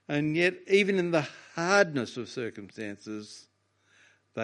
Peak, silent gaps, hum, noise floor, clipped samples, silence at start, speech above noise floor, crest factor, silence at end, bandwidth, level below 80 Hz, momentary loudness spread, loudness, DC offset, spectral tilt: -6 dBFS; none; none; -67 dBFS; under 0.1%; 0.1 s; 39 dB; 24 dB; 0 s; 11 kHz; -74 dBFS; 16 LU; -27 LUFS; under 0.1%; -5 dB/octave